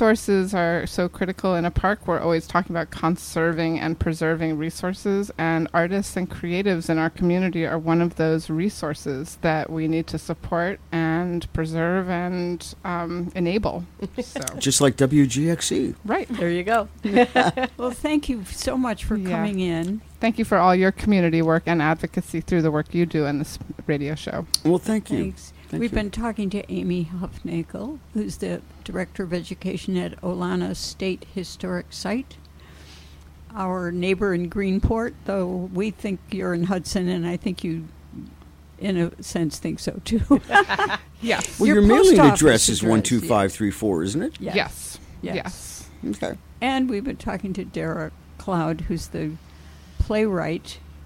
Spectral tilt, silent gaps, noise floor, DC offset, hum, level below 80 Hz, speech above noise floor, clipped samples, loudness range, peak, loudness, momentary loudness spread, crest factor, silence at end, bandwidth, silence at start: -5 dB/octave; none; -46 dBFS; under 0.1%; none; -40 dBFS; 23 dB; under 0.1%; 10 LU; -2 dBFS; -23 LUFS; 12 LU; 20 dB; 0 s; 16.5 kHz; 0 s